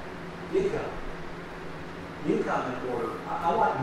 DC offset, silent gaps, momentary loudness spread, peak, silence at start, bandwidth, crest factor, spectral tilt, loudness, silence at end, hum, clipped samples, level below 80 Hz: under 0.1%; none; 13 LU; -14 dBFS; 0 s; 13 kHz; 18 dB; -6.5 dB/octave; -31 LUFS; 0 s; none; under 0.1%; -48 dBFS